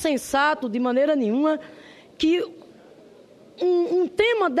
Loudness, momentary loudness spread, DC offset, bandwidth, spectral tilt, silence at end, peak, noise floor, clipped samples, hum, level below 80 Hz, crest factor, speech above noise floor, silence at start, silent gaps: -22 LUFS; 5 LU; under 0.1%; 13.5 kHz; -4 dB/octave; 0 s; -8 dBFS; -50 dBFS; under 0.1%; none; -58 dBFS; 16 dB; 28 dB; 0 s; none